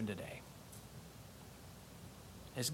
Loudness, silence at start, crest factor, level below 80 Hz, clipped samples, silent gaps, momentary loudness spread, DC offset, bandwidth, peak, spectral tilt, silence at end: -50 LUFS; 0 s; 22 dB; -66 dBFS; under 0.1%; none; 11 LU; under 0.1%; 16.5 kHz; -26 dBFS; -4 dB/octave; 0 s